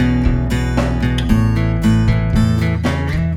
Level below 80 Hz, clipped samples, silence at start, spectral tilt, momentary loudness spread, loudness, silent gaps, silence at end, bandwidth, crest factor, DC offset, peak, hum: -22 dBFS; under 0.1%; 0 s; -7.5 dB/octave; 3 LU; -16 LUFS; none; 0 s; 13 kHz; 14 dB; under 0.1%; 0 dBFS; none